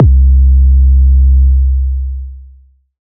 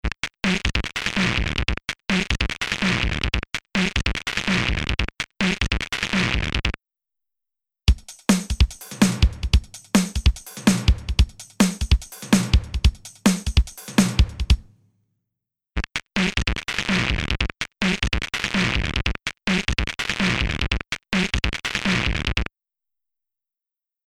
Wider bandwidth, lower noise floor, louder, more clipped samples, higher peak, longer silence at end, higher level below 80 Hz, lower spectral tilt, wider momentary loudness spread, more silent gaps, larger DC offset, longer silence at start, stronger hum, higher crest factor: second, 0.5 kHz vs 15 kHz; second, -42 dBFS vs -89 dBFS; first, -10 LUFS vs -23 LUFS; neither; first, 0 dBFS vs -4 dBFS; second, 0.6 s vs 1.65 s; first, -8 dBFS vs -28 dBFS; first, -17.5 dB/octave vs -4.5 dB/octave; first, 13 LU vs 5 LU; neither; neither; about the same, 0 s vs 0.05 s; neither; second, 8 dB vs 20 dB